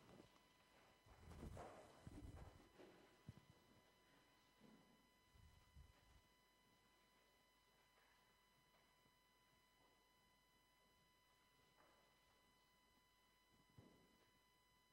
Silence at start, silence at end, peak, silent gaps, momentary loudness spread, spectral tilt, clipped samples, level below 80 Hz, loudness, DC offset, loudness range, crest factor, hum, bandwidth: 0 s; 0 s; -46 dBFS; none; 9 LU; -5 dB/octave; under 0.1%; -76 dBFS; -64 LUFS; under 0.1%; 3 LU; 24 dB; none; 16 kHz